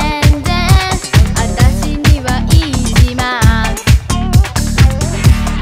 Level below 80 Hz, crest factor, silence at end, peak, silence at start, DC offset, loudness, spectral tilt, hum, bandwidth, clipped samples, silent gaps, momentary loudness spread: -14 dBFS; 10 dB; 0 s; 0 dBFS; 0 s; under 0.1%; -12 LUFS; -5 dB/octave; none; 16 kHz; 2%; none; 2 LU